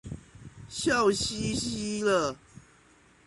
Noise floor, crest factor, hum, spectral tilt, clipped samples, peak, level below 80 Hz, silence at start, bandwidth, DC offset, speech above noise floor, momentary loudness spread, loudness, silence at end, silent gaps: -60 dBFS; 18 dB; none; -3.5 dB/octave; under 0.1%; -12 dBFS; -52 dBFS; 0.05 s; 11.5 kHz; under 0.1%; 32 dB; 20 LU; -28 LUFS; 0.65 s; none